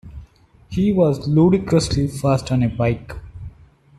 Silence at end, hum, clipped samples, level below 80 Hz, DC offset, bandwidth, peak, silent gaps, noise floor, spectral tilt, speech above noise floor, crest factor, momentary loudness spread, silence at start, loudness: 0.5 s; none; under 0.1%; -40 dBFS; under 0.1%; 13 kHz; -4 dBFS; none; -48 dBFS; -7 dB/octave; 31 dB; 16 dB; 21 LU; 0.05 s; -19 LUFS